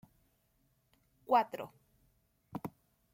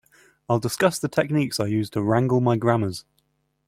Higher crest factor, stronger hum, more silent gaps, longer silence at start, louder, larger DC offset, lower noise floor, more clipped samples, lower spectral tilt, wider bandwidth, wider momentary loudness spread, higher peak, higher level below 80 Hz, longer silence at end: first, 24 dB vs 18 dB; neither; neither; first, 1.3 s vs 0.5 s; second, -34 LUFS vs -23 LUFS; neither; first, -75 dBFS vs -70 dBFS; neither; about the same, -6 dB/octave vs -6 dB/octave; about the same, 16.5 kHz vs 16 kHz; first, 18 LU vs 5 LU; second, -16 dBFS vs -4 dBFS; second, -76 dBFS vs -58 dBFS; second, 0.45 s vs 0.65 s